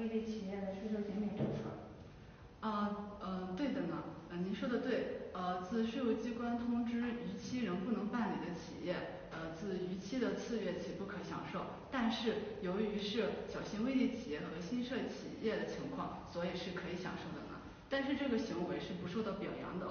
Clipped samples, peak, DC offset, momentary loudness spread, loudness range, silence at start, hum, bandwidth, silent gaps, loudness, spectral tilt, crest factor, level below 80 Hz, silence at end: under 0.1%; -24 dBFS; under 0.1%; 8 LU; 3 LU; 0 s; none; 6.6 kHz; none; -40 LUFS; -5 dB/octave; 16 dB; -64 dBFS; 0 s